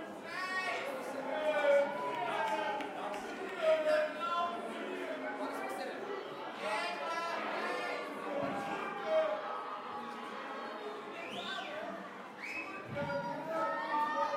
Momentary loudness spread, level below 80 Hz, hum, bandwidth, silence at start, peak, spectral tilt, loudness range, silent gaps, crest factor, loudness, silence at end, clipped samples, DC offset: 10 LU; -82 dBFS; none; 16 kHz; 0 s; -18 dBFS; -4 dB/octave; 7 LU; none; 18 dB; -37 LUFS; 0 s; under 0.1%; under 0.1%